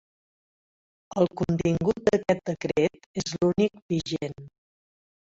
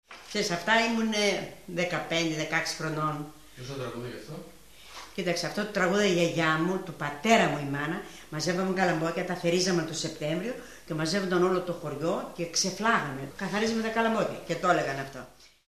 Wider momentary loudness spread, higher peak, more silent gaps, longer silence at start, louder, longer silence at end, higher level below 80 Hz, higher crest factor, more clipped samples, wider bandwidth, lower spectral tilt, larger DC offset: second, 9 LU vs 14 LU; about the same, -6 dBFS vs -8 dBFS; first, 3.06-3.14 s, 3.82-3.89 s vs none; first, 1.15 s vs 0.1 s; about the same, -26 LUFS vs -28 LUFS; first, 0.8 s vs 0.2 s; first, -54 dBFS vs -62 dBFS; about the same, 20 dB vs 20 dB; neither; second, 8 kHz vs 14 kHz; first, -6.5 dB/octave vs -4 dB/octave; second, under 0.1% vs 0.2%